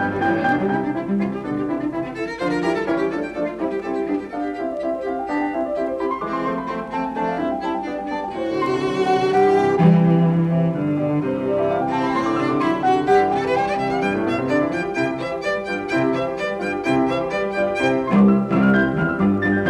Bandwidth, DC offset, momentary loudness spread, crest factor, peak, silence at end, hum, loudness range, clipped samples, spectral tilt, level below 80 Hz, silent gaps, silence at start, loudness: 10.5 kHz; under 0.1%; 9 LU; 16 dB; -2 dBFS; 0 s; none; 6 LU; under 0.1%; -7.5 dB/octave; -50 dBFS; none; 0 s; -20 LUFS